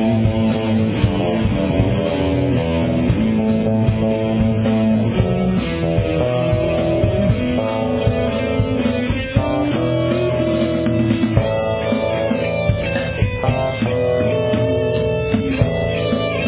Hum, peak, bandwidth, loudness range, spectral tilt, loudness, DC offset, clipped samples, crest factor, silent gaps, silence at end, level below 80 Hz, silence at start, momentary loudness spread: none; 0 dBFS; 4 kHz; 1 LU; -11.5 dB/octave; -18 LUFS; under 0.1%; under 0.1%; 16 dB; none; 0 s; -30 dBFS; 0 s; 2 LU